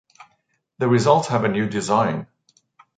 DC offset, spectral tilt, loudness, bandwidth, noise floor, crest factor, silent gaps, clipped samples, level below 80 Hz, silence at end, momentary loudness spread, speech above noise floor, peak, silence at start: under 0.1%; -6 dB/octave; -20 LUFS; 9.4 kHz; -68 dBFS; 20 dB; none; under 0.1%; -60 dBFS; 0.75 s; 8 LU; 49 dB; -2 dBFS; 0.8 s